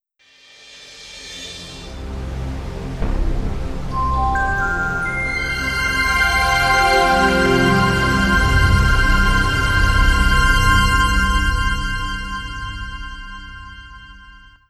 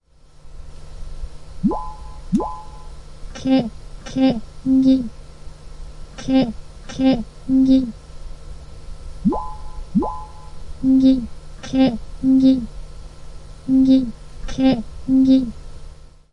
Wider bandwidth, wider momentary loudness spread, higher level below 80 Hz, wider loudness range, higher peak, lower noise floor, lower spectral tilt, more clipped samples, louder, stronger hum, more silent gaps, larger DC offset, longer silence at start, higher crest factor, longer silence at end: first, 15.5 kHz vs 9.4 kHz; second, 18 LU vs 25 LU; first, -22 dBFS vs -34 dBFS; first, 12 LU vs 6 LU; about the same, -2 dBFS vs -4 dBFS; first, -51 dBFS vs -42 dBFS; second, -4.5 dB/octave vs -7 dB/octave; neither; about the same, -17 LUFS vs -19 LUFS; neither; neither; neither; first, 0.7 s vs 0.45 s; about the same, 16 dB vs 16 dB; first, 0.4 s vs 0.25 s